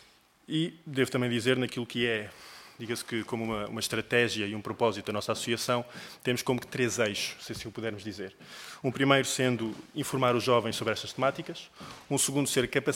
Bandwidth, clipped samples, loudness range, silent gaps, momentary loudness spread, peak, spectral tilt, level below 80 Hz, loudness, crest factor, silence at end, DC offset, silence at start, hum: 16.5 kHz; under 0.1%; 3 LU; none; 15 LU; -6 dBFS; -4 dB/octave; -64 dBFS; -30 LUFS; 24 dB; 0 s; under 0.1%; 0.5 s; none